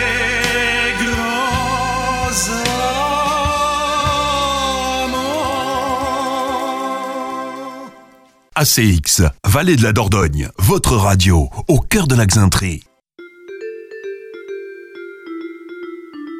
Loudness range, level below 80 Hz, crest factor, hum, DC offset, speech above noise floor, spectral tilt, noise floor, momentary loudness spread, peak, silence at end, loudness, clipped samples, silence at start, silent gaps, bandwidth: 7 LU; -30 dBFS; 16 dB; none; under 0.1%; 35 dB; -4 dB/octave; -48 dBFS; 18 LU; 0 dBFS; 0 s; -16 LUFS; under 0.1%; 0 s; none; 16.5 kHz